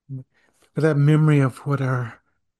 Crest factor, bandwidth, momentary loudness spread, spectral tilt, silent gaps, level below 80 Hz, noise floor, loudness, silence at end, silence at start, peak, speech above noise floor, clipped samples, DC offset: 16 dB; 10.5 kHz; 18 LU; -8.5 dB/octave; none; -62 dBFS; -63 dBFS; -20 LUFS; 0.45 s; 0.1 s; -6 dBFS; 44 dB; under 0.1%; under 0.1%